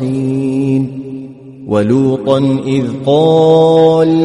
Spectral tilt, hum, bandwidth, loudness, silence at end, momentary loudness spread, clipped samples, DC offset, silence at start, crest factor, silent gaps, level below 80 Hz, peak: -8 dB/octave; none; 10.5 kHz; -11 LUFS; 0 s; 18 LU; under 0.1%; under 0.1%; 0 s; 12 dB; none; -50 dBFS; 0 dBFS